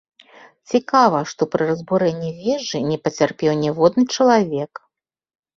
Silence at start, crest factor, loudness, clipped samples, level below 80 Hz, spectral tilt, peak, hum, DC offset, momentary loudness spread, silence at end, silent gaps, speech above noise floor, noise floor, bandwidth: 0.7 s; 18 dB; -19 LUFS; under 0.1%; -60 dBFS; -5.5 dB/octave; -2 dBFS; none; under 0.1%; 7 LU; 0.9 s; none; 57 dB; -75 dBFS; 7.6 kHz